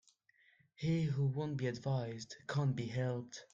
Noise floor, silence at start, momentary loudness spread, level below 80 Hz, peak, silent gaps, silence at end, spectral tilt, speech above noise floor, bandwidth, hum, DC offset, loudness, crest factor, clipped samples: -71 dBFS; 0.8 s; 8 LU; -70 dBFS; -24 dBFS; none; 0.1 s; -7 dB/octave; 34 dB; 7.6 kHz; none; under 0.1%; -38 LUFS; 14 dB; under 0.1%